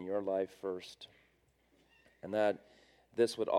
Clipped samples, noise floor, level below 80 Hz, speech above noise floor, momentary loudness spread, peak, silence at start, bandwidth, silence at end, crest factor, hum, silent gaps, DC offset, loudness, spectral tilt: under 0.1%; -72 dBFS; -78 dBFS; 37 dB; 18 LU; -18 dBFS; 0 s; 14.5 kHz; 0 s; 20 dB; none; none; under 0.1%; -37 LUFS; -5 dB/octave